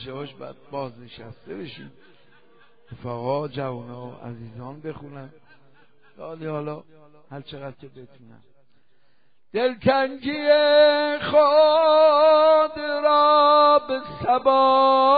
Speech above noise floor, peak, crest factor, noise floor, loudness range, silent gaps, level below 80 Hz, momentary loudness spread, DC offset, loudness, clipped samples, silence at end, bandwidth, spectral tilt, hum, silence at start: 48 dB; -6 dBFS; 16 dB; -69 dBFS; 21 LU; none; -62 dBFS; 23 LU; 0.3%; -19 LUFS; under 0.1%; 0 s; 5 kHz; -2.5 dB/octave; none; 0 s